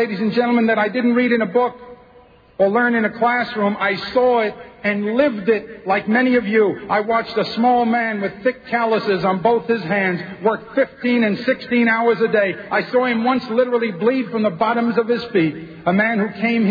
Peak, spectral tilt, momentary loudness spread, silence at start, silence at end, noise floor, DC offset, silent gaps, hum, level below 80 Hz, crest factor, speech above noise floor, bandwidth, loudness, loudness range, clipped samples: -4 dBFS; -8 dB/octave; 5 LU; 0 s; 0 s; -48 dBFS; under 0.1%; none; none; -58 dBFS; 14 dB; 30 dB; 5 kHz; -18 LUFS; 1 LU; under 0.1%